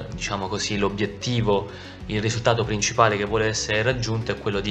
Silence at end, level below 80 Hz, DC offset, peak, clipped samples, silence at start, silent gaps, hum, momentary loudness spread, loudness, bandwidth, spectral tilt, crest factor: 0 s; -42 dBFS; under 0.1%; -2 dBFS; under 0.1%; 0 s; none; none; 8 LU; -23 LUFS; 9 kHz; -4.5 dB/octave; 22 dB